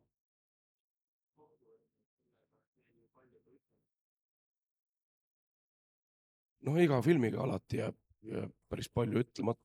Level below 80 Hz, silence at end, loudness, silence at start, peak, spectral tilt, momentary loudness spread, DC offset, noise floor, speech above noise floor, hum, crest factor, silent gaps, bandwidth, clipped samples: -66 dBFS; 0.1 s; -34 LUFS; 6.65 s; -16 dBFS; -7.5 dB/octave; 14 LU; under 0.1%; -80 dBFS; 45 dB; none; 22 dB; none; 13.5 kHz; under 0.1%